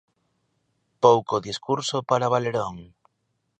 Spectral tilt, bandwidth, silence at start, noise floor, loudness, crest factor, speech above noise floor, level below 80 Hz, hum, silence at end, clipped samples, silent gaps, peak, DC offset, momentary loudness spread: -5 dB/octave; 9.4 kHz; 1 s; -75 dBFS; -23 LUFS; 22 dB; 52 dB; -62 dBFS; none; 0.75 s; under 0.1%; none; -2 dBFS; under 0.1%; 10 LU